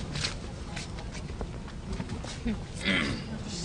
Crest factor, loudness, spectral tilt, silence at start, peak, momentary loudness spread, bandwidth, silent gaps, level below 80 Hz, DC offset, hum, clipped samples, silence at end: 20 dB; -34 LUFS; -4 dB/octave; 0 s; -14 dBFS; 11 LU; 11 kHz; none; -42 dBFS; under 0.1%; none; under 0.1%; 0 s